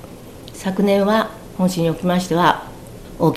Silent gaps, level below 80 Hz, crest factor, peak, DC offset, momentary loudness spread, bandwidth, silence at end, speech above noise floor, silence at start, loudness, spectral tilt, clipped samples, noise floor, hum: none; -44 dBFS; 18 dB; 0 dBFS; 0.2%; 21 LU; 16 kHz; 0 s; 20 dB; 0 s; -19 LUFS; -6 dB/octave; under 0.1%; -37 dBFS; none